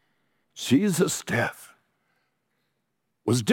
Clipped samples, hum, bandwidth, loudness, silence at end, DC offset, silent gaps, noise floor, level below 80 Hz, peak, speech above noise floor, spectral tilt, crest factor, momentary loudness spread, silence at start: under 0.1%; none; 17 kHz; -25 LUFS; 0 s; under 0.1%; none; -78 dBFS; -68 dBFS; -8 dBFS; 54 dB; -4.5 dB/octave; 18 dB; 10 LU; 0.55 s